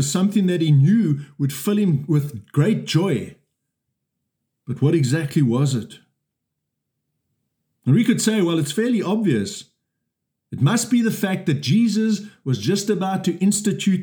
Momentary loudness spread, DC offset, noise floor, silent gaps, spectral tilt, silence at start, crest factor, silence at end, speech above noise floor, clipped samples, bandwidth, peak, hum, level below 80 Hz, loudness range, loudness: 9 LU; under 0.1%; -79 dBFS; none; -6 dB/octave; 0 s; 14 dB; 0 s; 60 dB; under 0.1%; over 20 kHz; -6 dBFS; none; -70 dBFS; 4 LU; -20 LUFS